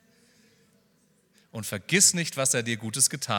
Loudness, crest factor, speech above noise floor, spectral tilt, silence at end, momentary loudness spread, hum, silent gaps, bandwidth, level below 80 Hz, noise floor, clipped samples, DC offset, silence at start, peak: -23 LUFS; 24 dB; 40 dB; -2 dB/octave; 0 s; 16 LU; none; none; 18.5 kHz; -72 dBFS; -66 dBFS; under 0.1%; under 0.1%; 1.55 s; -4 dBFS